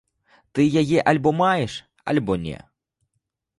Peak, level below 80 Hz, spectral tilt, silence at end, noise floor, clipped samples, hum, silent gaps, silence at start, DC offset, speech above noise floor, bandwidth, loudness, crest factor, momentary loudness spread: -4 dBFS; -52 dBFS; -6.5 dB/octave; 1.05 s; -77 dBFS; under 0.1%; none; none; 0.55 s; under 0.1%; 57 dB; 11.5 kHz; -21 LUFS; 18 dB; 14 LU